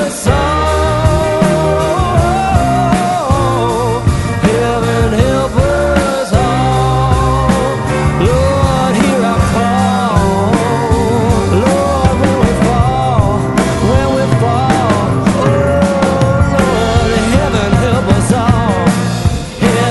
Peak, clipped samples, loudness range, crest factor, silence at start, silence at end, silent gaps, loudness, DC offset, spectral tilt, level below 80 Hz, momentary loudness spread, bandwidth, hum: 0 dBFS; under 0.1%; 1 LU; 10 dB; 0 s; 0 s; none; -12 LUFS; under 0.1%; -6 dB/octave; -22 dBFS; 2 LU; 12 kHz; none